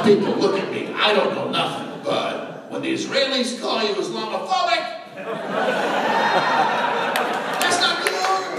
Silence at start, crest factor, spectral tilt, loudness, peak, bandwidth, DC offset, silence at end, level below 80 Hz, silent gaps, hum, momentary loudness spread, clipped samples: 0 s; 20 dB; -3 dB/octave; -21 LUFS; -2 dBFS; 15.5 kHz; under 0.1%; 0 s; -76 dBFS; none; none; 9 LU; under 0.1%